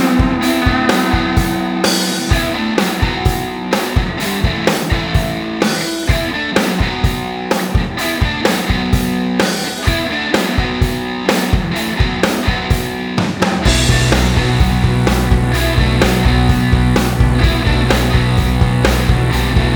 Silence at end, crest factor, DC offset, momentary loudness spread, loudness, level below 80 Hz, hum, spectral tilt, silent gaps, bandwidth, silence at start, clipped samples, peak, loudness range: 0 s; 14 dB; under 0.1%; 5 LU; -15 LUFS; -20 dBFS; none; -5 dB/octave; none; over 20 kHz; 0 s; under 0.1%; 0 dBFS; 3 LU